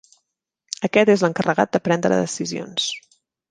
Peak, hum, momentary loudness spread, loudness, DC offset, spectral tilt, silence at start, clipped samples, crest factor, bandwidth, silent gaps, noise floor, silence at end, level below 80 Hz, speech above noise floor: -2 dBFS; none; 11 LU; -20 LUFS; under 0.1%; -4.5 dB/octave; 0.8 s; under 0.1%; 20 dB; 10 kHz; none; -77 dBFS; 0.5 s; -64 dBFS; 58 dB